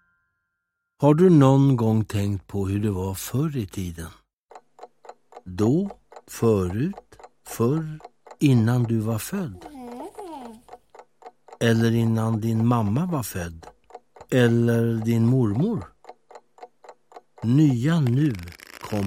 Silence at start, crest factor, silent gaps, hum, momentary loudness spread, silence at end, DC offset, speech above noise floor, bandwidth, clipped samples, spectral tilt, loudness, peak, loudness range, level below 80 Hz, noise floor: 1 s; 20 dB; 4.33-4.43 s; none; 19 LU; 0 s; under 0.1%; 59 dB; 16.5 kHz; under 0.1%; -7.5 dB/octave; -22 LUFS; -4 dBFS; 7 LU; -54 dBFS; -80 dBFS